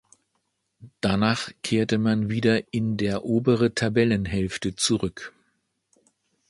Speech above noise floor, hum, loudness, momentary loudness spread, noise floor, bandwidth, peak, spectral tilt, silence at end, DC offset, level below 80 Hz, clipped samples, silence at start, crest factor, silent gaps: 52 dB; none; -24 LUFS; 6 LU; -75 dBFS; 11.5 kHz; -6 dBFS; -5.5 dB/octave; 1.2 s; under 0.1%; -50 dBFS; under 0.1%; 0.8 s; 20 dB; none